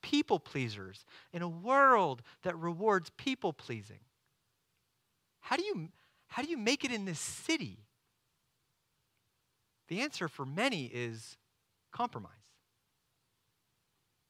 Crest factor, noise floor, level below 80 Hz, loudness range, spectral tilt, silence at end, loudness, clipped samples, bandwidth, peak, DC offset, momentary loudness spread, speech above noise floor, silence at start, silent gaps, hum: 24 dB; -80 dBFS; -78 dBFS; 9 LU; -4 dB/octave; 2 s; -34 LUFS; under 0.1%; 16 kHz; -12 dBFS; under 0.1%; 17 LU; 46 dB; 0.05 s; none; none